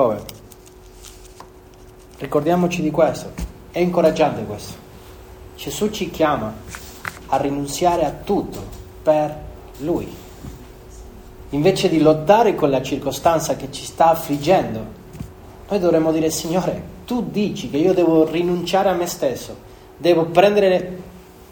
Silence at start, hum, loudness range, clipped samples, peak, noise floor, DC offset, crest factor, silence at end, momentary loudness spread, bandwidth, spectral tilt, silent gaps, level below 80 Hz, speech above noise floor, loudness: 0 s; none; 6 LU; under 0.1%; 0 dBFS; -43 dBFS; under 0.1%; 20 dB; 0.3 s; 21 LU; over 20 kHz; -5.5 dB/octave; none; -42 dBFS; 25 dB; -19 LUFS